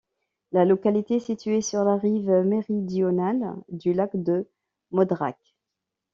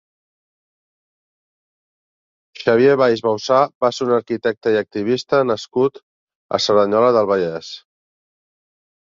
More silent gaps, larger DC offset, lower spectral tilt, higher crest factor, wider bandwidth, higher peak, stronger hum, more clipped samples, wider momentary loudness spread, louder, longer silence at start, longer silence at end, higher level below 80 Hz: second, none vs 3.75-3.81 s, 6.03-6.27 s, 6.36-6.49 s; neither; first, -8 dB/octave vs -5 dB/octave; about the same, 18 dB vs 18 dB; about the same, 7.6 kHz vs 7.6 kHz; second, -6 dBFS vs -2 dBFS; neither; neither; about the same, 7 LU vs 9 LU; second, -24 LUFS vs -17 LUFS; second, 0.5 s vs 2.6 s; second, 0.8 s vs 1.4 s; second, -68 dBFS vs -62 dBFS